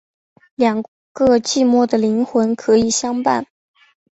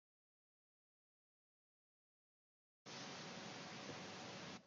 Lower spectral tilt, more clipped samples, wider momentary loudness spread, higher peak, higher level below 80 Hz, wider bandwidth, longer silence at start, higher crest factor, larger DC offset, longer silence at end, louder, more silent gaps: about the same, -4 dB/octave vs -3 dB/octave; neither; first, 10 LU vs 3 LU; first, -2 dBFS vs -40 dBFS; first, -52 dBFS vs under -90 dBFS; about the same, 8.2 kHz vs 8.8 kHz; second, 0.6 s vs 2.85 s; about the same, 16 dB vs 18 dB; neither; first, 0.7 s vs 0 s; first, -17 LUFS vs -52 LUFS; first, 0.88-1.15 s vs none